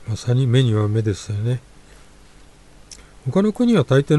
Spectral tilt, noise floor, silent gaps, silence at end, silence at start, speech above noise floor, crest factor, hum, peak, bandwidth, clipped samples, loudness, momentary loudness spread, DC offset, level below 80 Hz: -7.5 dB/octave; -46 dBFS; none; 0 s; 0 s; 28 dB; 16 dB; 50 Hz at -50 dBFS; -4 dBFS; 11.5 kHz; under 0.1%; -19 LUFS; 8 LU; under 0.1%; -48 dBFS